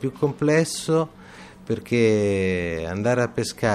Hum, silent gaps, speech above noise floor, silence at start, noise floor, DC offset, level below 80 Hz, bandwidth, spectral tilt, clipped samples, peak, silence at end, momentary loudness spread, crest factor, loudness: none; none; 22 dB; 0 s; -44 dBFS; under 0.1%; -54 dBFS; 14 kHz; -5.5 dB/octave; under 0.1%; -6 dBFS; 0 s; 10 LU; 16 dB; -23 LUFS